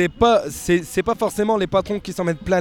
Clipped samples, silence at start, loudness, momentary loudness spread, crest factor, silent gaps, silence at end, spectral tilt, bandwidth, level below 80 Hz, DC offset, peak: under 0.1%; 0 s; -20 LUFS; 7 LU; 16 dB; none; 0 s; -5 dB/octave; 17.5 kHz; -42 dBFS; under 0.1%; -4 dBFS